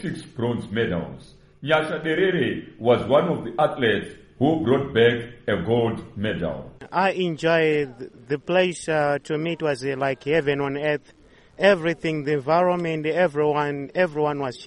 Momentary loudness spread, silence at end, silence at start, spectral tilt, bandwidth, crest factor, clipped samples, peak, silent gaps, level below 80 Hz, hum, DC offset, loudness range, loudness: 9 LU; 0 s; 0 s; -6 dB/octave; 11 kHz; 18 dB; under 0.1%; -4 dBFS; none; -54 dBFS; none; under 0.1%; 2 LU; -23 LUFS